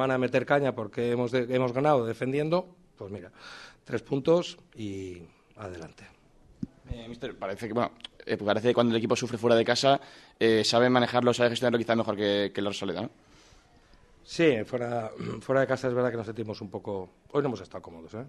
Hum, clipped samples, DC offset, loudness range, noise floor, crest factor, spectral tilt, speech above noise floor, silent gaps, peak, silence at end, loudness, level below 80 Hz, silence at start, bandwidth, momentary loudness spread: none; under 0.1%; under 0.1%; 9 LU; -58 dBFS; 20 dB; -5.5 dB/octave; 30 dB; none; -8 dBFS; 0 s; -27 LUFS; -60 dBFS; 0 s; 12 kHz; 19 LU